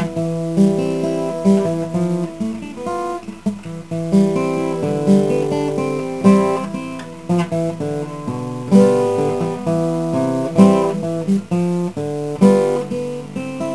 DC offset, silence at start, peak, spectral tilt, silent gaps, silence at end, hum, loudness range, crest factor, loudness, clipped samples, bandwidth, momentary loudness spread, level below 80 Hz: 0.5%; 0 s; 0 dBFS; -7.5 dB/octave; none; 0 s; none; 4 LU; 18 dB; -18 LUFS; under 0.1%; 11 kHz; 12 LU; -52 dBFS